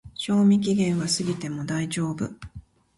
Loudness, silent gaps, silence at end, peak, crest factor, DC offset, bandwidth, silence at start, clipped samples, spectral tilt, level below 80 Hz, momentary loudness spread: -24 LUFS; none; 0.35 s; -10 dBFS; 14 dB; under 0.1%; 11.5 kHz; 0.05 s; under 0.1%; -5.5 dB/octave; -54 dBFS; 13 LU